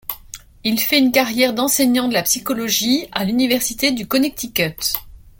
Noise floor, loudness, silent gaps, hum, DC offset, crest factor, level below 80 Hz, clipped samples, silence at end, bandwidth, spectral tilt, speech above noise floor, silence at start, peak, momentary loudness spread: -39 dBFS; -17 LUFS; none; none; under 0.1%; 18 dB; -48 dBFS; under 0.1%; 0.2 s; 17 kHz; -2.5 dB/octave; 21 dB; 0.1 s; 0 dBFS; 7 LU